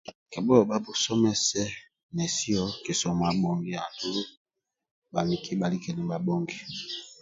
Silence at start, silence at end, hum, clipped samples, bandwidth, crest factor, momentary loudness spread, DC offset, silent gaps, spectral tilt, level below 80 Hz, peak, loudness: 0.05 s; 0.1 s; none; under 0.1%; 7.8 kHz; 24 dB; 12 LU; under 0.1%; 0.15-0.26 s, 2.03-2.09 s, 4.37-4.45 s, 4.91-5.02 s; -4.5 dB/octave; -58 dBFS; -6 dBFS; -28 LUFS